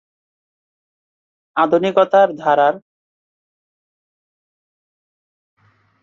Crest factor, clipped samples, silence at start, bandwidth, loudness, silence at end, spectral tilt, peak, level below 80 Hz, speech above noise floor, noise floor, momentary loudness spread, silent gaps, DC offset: 20 dB; under 0.1%; 1.55 s; 7 kHz; -15 LUFS; 3.25 s; -6.5 dB/octave; -2 dBFS; -70 dBFS; over 76 dB; under -90 dBFS; 9 LU; none; under 0.1%